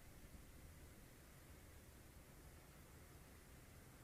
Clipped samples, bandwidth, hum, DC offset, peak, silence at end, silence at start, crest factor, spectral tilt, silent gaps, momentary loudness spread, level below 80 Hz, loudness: under 0.1%; 15.5 kHz; none; under 0.1%; -48 dBFS; 0 s; 0 s; 14 dB; -4.5 dB/octave; none; 1 LU; -66 dBFS; -63 LUFS